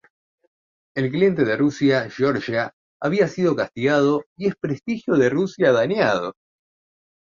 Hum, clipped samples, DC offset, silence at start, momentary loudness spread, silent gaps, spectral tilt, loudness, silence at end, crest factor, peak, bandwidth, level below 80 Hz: none; under 0.1%; under 0.1%; 0.95 s; 8 LU; 2.73-3.00 s, 4.26-4.36 s; -6.5 dB/octave; -21 LUFS; 1 s; 18 dB; -4 dBFS; 7.4 kHz; -60 dBFS